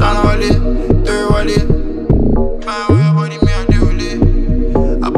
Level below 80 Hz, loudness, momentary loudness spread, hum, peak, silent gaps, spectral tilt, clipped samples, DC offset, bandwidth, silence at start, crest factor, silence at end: -16 dBFS; -14 LUFS; 5 LU; none; 0 dBFS; none; -7 dB/octave; under 0.1%; under 0.1%; 10 kHz; 0 s; 10 dB; 0 s